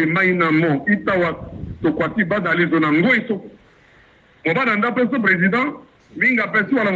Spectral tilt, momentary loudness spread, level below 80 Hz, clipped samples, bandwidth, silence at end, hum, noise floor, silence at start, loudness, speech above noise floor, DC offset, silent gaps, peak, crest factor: -8 dB/octave; 8 LU; -50 dBFS; under 0.1%; 7.6 kHz; 0 s; none; -51 dBFS; 0 s; -18 LUFS; 34 dB; under 0.1%; none; -4 dBFS; 14 dB